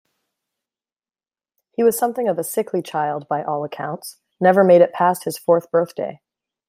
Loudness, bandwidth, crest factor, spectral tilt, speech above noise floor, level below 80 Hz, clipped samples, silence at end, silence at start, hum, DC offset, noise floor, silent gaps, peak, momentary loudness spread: -19 LUFS; 16 kHz; 18 dB; -5.5 dB/octave; over 72 dB; -70 dBFS; under 0.1%; 0.55 s; 1.8 s; none; under 0.1%; under -90 dBFS; none; -2 dBFS; 16 LU